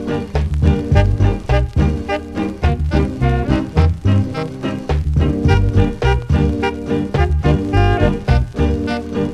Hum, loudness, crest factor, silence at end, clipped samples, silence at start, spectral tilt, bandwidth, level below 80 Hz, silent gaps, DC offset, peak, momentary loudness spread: none; -17 LUFS; 16 dB; 0 s; under 0.1%; 0 s; -8 dB/octave; 9.4 kHz; -20 dBFS; none; under 0.1%; 0 dBFS; 6 LU